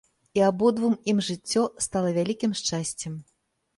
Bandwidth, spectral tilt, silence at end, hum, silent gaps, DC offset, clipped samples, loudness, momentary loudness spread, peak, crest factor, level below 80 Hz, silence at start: 11.5 kHz; -4.5 dB/octave; 0.55 s; none; none; under 0.1%; under 0.1%; -25 LUFS; 9 LU; -10 dBFS; 16 dB; -62 dBFS; 0.35 s